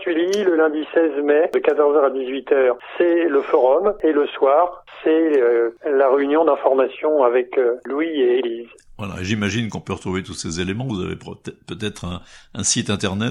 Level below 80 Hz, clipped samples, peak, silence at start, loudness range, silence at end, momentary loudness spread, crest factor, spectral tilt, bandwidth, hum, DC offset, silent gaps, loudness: -52 dBFS; under 0.1%; -2 dBFS; 0 s; 8 LU; 0 s; 12 LU; 16 dB; -4.5 dB/octave; 12 kHz; none; under 0.1%; none; -19 LUFS